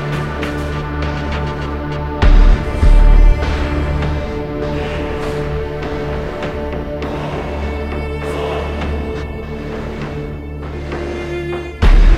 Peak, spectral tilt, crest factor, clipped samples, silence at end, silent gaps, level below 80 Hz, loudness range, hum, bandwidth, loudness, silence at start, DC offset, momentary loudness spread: 0 dBFS; -7 dB/octave; 14 dB; under 0.1%; 0 s; none; -16 dBFS; 7 LU; none; 7.2 kHz; -19 LUFS; 0 s; under 0.1%; 11 LU